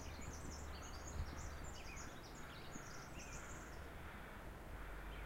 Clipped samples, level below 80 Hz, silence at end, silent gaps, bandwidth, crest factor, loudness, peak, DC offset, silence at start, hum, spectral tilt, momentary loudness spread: under 0.1%; -54 dBFS; 0 s; none; 16 kHz; 18 dB; -52 LUFS; -34 dBFS; under 0.1%; 0 s; none; -4 dB/octave; 4 LU